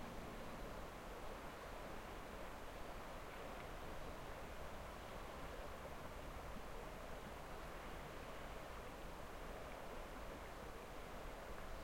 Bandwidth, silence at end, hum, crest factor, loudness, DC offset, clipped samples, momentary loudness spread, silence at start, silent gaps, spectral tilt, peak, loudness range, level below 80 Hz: 16.5 kHz; 0 s; none; 14 dB; -53 LUFS; under 0.1%; under 0.1%; 1 LU; 0 s; none; -4.5 dB/octave; -36 dBFS; 0 LU; -56 dBFS